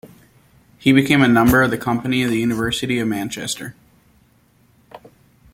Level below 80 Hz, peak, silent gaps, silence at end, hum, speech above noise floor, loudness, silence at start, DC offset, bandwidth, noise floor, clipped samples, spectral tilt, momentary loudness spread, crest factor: -44 dBFS; -2 dBFS; none; 0.55 s; none; 39 dB; -17 LUFS; 0.05 s; under 0.1%; 16.5 kHz; -56 dBFS; under 0.1%; -5 dB/octave; 12 LU; 18 dB